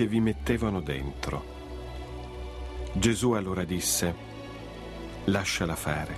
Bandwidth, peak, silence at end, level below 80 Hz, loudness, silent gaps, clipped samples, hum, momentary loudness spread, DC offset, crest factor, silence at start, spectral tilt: 15 kHz; -10 dBFS; 0 s; -42 dBFS; -30 LUFS; none; under 0.1%; none; 15 LU; under 0.1%; 20 dB; 0 s; -4.5 dB/octave